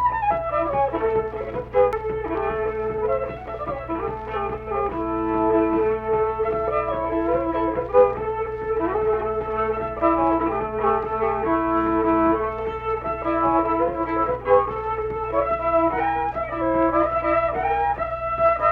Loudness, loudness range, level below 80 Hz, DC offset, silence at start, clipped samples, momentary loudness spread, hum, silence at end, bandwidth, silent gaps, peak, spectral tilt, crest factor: -22 LUFS; 3 LU; -40 dBFS; under 0.1%; 0 s; under 0.1%; 7 LU; none; 0 s; 4.9 kHz; none; -4 dBFS; -9 dB/octave; 18 dB